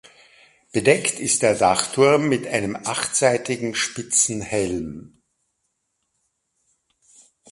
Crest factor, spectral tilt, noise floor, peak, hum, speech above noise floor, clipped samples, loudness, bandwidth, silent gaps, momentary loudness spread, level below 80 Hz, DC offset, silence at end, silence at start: 22 dB; -3 dB/octave; -74 dBFS; 0 dBFS; none; 54 dB; under 0.1%; -20 LUFS; 11.5 kHz; none; 9 LU; -54 dBFS; under 0.1%; 2.5 s; 0.75 s